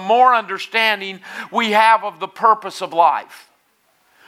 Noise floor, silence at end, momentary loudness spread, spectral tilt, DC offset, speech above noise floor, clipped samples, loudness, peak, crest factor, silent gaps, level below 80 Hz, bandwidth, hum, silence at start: -61 dBFS; 0.9 s; 12 LU; -3 dB/octave; under 0.1%; 44 dB; under 0.1%; -16 LUFS; 0 dBFS; 18 dB; none; -84 dBFS; 15.5 kHz; none; 0 s